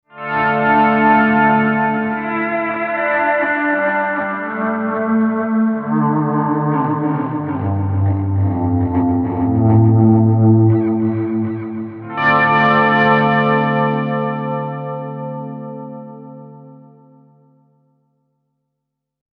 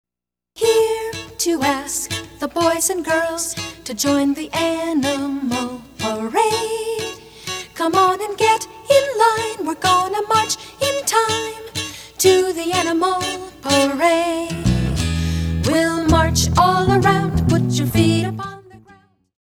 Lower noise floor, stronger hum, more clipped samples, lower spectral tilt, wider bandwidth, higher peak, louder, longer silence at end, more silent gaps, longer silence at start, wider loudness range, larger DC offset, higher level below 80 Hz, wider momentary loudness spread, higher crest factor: second, -78 dBFS vs -87 dBFS; neither; neither; first, -10 dB/octave vs -4.5 dB/octave; second, 5 kHz vs over 20 kHz; about the same, 0 dBFS vs 0 dBFS; about the same, -16 LUFS vs -18 LUFS; first, 2.6 s vs 0.7 s; neither; second, 0.15 s vs 0.55 s; first, 11 LU vs 4 LU; neither; second, -48 dBFS vs -36 dBFS; first, 14 LU vs 11 LU; about the same, 16 dB vs 18 dB